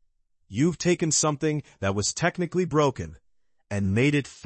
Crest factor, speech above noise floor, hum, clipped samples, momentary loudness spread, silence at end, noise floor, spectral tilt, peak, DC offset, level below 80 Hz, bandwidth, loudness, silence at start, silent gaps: 16 dB; 43 dB; none; under 0.1%; 9 LU; 0.1 s; -68 dBFS; -4.5 dB/octave; -10 dBFS; under 0.1%; -56 dBFS; 8.8 kHz; -25 LUFS; 0.5 s; none